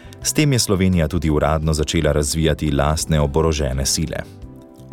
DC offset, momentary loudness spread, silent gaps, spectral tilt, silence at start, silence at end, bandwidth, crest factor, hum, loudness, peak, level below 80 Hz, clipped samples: under 0.1%; 4 LU; none; -5 dB/octave; 0.05 s; 0 s; 17.5 kHz; 14 dB; none; -18 LUFS; -4 dBFS; -28 dBFS; under 0.1%